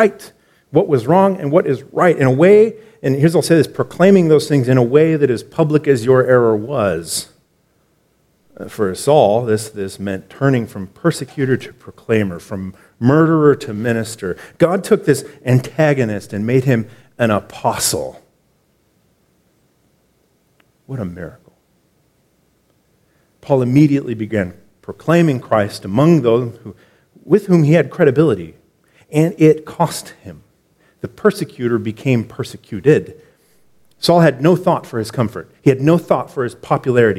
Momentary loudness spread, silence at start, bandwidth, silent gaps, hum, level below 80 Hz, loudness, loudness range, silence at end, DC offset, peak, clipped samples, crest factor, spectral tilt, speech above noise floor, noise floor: 15 LU; 0 s; 15.5 kHz; none; none; -54 dBFS; -15 LUFS; 10 LU; 0 s; under 0.1%; 0 dBFS; under 0.1%; 16 dB; -6.5 dB/octave; 45 dB; -60 dBFS